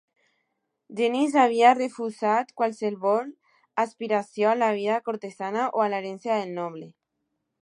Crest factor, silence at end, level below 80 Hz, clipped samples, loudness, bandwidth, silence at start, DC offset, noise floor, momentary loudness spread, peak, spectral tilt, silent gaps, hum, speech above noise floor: 20 dB; 0.75 s; -84 dBFS; under 0.1%; -25 LUFS; 10.5 kHz; 0.9 s; under 0.1%; -79 dBFS; 14 LU; -4 dBFS; -5 dB/octave; none; none; 55 dB